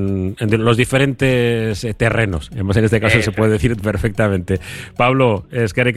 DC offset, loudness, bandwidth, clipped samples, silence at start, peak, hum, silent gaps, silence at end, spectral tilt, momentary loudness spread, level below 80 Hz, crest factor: under 0.1%; -16 LUFS; 13 kHz; under 0.1%; 0 s; 0 dBFS; none; none; 0 s; -6.5 dB/octave; 7 LU; -34 dBFS; 16 dB